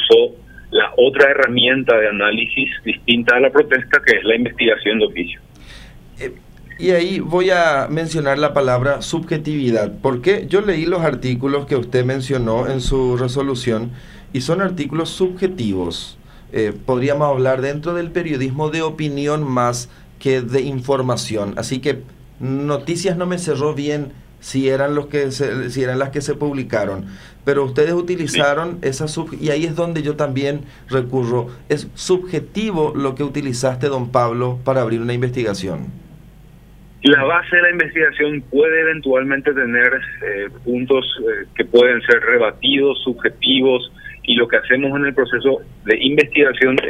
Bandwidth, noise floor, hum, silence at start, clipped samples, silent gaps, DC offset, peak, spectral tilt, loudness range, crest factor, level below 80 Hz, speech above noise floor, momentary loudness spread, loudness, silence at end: 14 kHz; -43 dBFS; none; 0 s; under 0.1%; none; under 0.1%; 0 dBFS; -5 dB/octave; 6 LU; 18 dB; -42 dBFS; 25 dB; 10 LU; -17 LUFS; 0 s